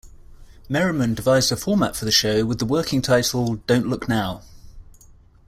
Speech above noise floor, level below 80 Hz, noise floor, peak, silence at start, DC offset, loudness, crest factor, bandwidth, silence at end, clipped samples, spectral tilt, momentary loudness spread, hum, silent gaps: 29 dB; -44 dBFS; -50 dBFS; -4 dBFS; 0.05 s; under 0.1%; -20 LUFS; 18 dB; 16 kHz; 0.65 s; under 0.1%; -4.5 dB/octave; 6 LU; none; none